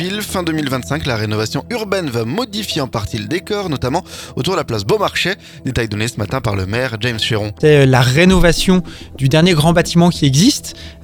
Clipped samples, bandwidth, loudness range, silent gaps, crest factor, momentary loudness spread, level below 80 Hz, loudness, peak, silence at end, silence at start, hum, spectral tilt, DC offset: under 0.1%; 19 kHz; 7 LU; none; 16 dB; 10 LU; -30 dBFS; -15 LUFS; 0 dBFS; 0 s; 0 s; none; -5 dB/octave; under 0.1%